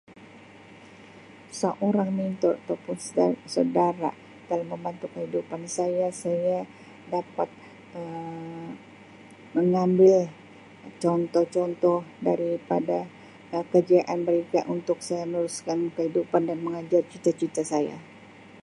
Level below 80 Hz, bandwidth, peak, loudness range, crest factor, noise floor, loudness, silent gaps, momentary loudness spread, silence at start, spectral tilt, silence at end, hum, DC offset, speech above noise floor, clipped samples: -72 dBFS; 11.5 kHz; -8 dBFS; 6 LU; 20 dB; -49 dBFS; -26 LUFS; none; 14 LU; 0.2 s; -6.5 dB/octave; 0 s; none; under 0.1%; 23 dB; under 0.1%